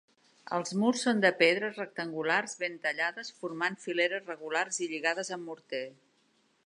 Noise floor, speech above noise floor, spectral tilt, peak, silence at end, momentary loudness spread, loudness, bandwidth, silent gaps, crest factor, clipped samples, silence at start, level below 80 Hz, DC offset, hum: -70 dBFS; 39 dB; -3.5 dB/octave; -8 dBFS; 0.75 s; 13 LU; -31 LUFS; 11 kHz; none; 24 dB; under 0.1%; 0.45 s; -86 dBFS; under 0.1%; none